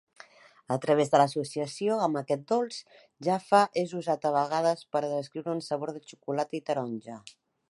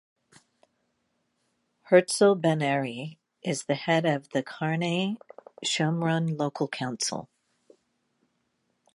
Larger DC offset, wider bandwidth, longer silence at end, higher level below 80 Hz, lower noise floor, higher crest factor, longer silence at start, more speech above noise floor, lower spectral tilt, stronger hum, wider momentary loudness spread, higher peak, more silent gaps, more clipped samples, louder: neither; about the same, 11.5 kHz vs 11.5 kHz; second, 0.4 s vs 1.7 s; about the same, -80 dBFS vs -76 dBFS; second, -54 dBFS vs -75 dBFS; about the same, 22 dB vs 22 dB; second, 0.7 s vs 1.9 s; second, 26 dB vs 49 dB; about the same, -5.5 dB/octave vs -5 dB/octave; neither; about the same, 13 LU vs 12 LU; about the same, -8 dBFS vs -6 dBFS; neither; neither; about the same, -29 LUFS vs -27 LUFS